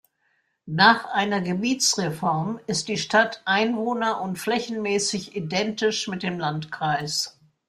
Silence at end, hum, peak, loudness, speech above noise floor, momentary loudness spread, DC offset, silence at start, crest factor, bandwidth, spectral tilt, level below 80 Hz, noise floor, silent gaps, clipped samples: 0.4 s; none; -2 dBFS; -23 LUFS; 46 dB; 9 LU; under 0.1%; 0.65 s; 22 dB; 15.5 kHz; -3.5 dB/octave; -64 dBFS; -70 dBFS; none; under 0.1%